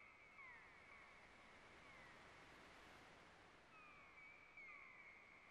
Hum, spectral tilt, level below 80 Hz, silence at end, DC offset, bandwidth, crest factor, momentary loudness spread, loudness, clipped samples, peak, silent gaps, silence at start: none; -3.5 dB/octave; -82 dBFS; 0 s; under 0.1%; 12 kHz; 14 dB; 5 LU; -63 LUFS; under 0.1%; -50 dBFS; none; 0 s